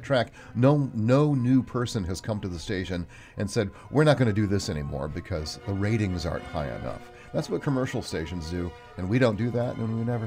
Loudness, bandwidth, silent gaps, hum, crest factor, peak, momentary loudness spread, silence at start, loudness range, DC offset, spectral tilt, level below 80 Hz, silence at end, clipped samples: -27 LUFS; 15.5 kHz; none; none; 20 dB; -6 dBFS; 11 LU; 0 s; 4 LU; under 0.1%; -7 dB/octave; -46 dBFS; 0 s; under 0.1%